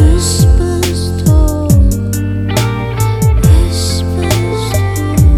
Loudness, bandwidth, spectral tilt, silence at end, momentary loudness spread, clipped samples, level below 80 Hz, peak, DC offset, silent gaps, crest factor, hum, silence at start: -12 LUFS; 15.5 kHz; -5.5 dB/octave; 0 s; 5 LU; under 0.1%; -14 dBFS; 0 dBFS; under 0.1%; none; 10 dB; none; 0 s